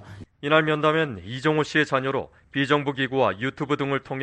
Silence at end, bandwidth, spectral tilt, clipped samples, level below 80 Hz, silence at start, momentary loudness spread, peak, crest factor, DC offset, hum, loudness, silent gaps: 0 s; 9.2 kHz; -6 dB/octave; under 0.1%; -60 dBFS; 0 s; 8 LU; -4 dBFS; 20 dB; under 0.1%; none; -24 LUFS; none